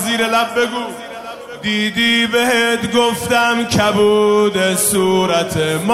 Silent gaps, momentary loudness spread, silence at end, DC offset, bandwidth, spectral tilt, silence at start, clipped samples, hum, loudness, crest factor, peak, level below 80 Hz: none; 11 LU; 0 s; 0.2%; 16 kHz; -3.5 dB/octave; 0 s; under 0.1%; none; -14 LUFS; 14 dB; -2 dBFS; -48 dBFS